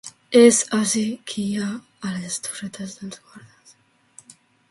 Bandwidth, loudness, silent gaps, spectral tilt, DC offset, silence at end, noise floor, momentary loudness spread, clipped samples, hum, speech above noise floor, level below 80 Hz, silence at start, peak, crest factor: 11.5 kHz; -20 LUFS; none; -3.5 dB/octave; under 0.1%; 1.3 s; -57 dBFS; 20 LU; under 0.1%; none; 36 dB; -66 dBFS; 0.05 s; -2 dBFS; 22 dB